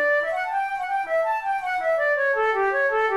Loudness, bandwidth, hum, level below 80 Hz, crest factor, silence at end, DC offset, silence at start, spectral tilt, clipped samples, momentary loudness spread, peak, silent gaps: -23 LUFS; 13 kHz; none; -60 dBFS; 10 dB; 0 s; 0.1%; 0 s; -3 dB/octave; under 0.1%; 5 LU; -12 dBFS; none